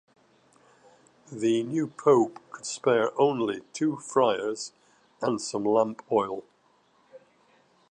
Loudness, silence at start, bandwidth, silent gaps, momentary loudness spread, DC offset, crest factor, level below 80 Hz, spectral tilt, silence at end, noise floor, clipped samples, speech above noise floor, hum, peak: -27 LUFS; 1.3 s; 9.6 kHz; none; 13 LU; under 0.1%; 20 dB; -76 dBFS; -5 dB/octave; 0.75 s; -65 dBFS; under 0.1%; 39 dB; none; -8 dBFS